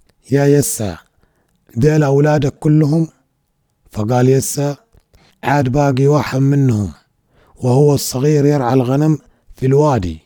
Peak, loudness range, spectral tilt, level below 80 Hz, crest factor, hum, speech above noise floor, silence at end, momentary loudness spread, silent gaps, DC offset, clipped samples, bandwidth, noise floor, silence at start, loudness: 0 dBFS; 2 LU; -6.5 dB/octave; -42 dBFS; 14 dB; none; 52 dB; 0.05 s; 11 LU; none; under 0.1%; under 0.1%; over 20 kHz; -65 dBFS; 0.3 s; -15 LUFS